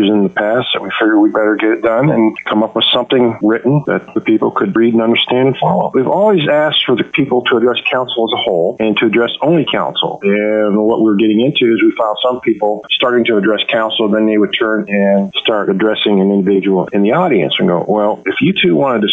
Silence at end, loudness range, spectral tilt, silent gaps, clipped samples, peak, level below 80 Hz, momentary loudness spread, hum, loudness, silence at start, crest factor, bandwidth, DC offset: 0 s; 1 LU; -8 dB/octave; none; under 0.1%; -2 dBFS; -56 dBFS; 4 LU; none; -12 LUFS; 0 s; 10 dB; 4 kHz; under 0.1%